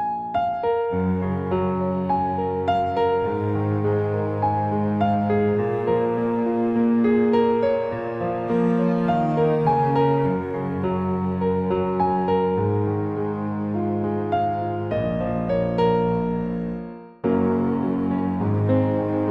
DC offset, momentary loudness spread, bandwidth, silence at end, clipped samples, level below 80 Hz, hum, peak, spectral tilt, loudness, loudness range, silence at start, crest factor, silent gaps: under 0.1%; 6 LU; 5.6 kHz; 0 s; under 0.1%; -48 dBFS; none; -8 dBFS; -10 dB/octave; -22 LUFS; 3 LU; 0 s; 14 dB; none